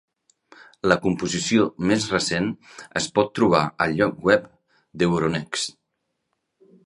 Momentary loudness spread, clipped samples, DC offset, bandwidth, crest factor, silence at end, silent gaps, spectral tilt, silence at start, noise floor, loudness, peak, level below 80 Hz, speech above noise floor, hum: 8 LU; under 0.1%; under 0.1%; 11.5 kHz; 24 dB; 1.15 s; none; -4.5 dB/octave; 0.85 s; -77 dBFS; -22 LUFS; 0 dBFS; -54 dBFS; 55 dB; none